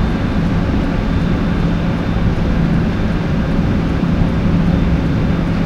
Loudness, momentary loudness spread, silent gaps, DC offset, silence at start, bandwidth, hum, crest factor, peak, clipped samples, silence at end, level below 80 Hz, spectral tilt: -16 LUFS; 2 LU; none; under 0.1%; 0 s; 7.4 kHz; none; 12 dB; -2 dBFS; under 0.1%; 0 s; -20 dBFS; -8.5 dB/octave